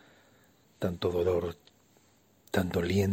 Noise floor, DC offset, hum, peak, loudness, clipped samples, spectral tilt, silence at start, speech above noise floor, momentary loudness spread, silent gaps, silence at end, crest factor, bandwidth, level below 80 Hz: -65 dBFS; under 0.1%; none; -12 dBFS; -31 LUFS; under 0.1%; -6.5 dB/octave; 0.8 s; 36 dB; 9 LU; none; 0 s; 20 dB; 16.5 kHz; -56 dBFS